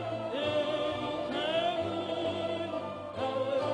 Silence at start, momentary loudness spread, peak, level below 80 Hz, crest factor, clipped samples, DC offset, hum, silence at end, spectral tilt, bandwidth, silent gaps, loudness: 0 s; 5 LU; -18 dBFS; -62 dBFS; 14 dB; under 0.1%; under 0.1%; none; 0 s; -5.5 dB/octave; 11 kHz; none; -33 LUFS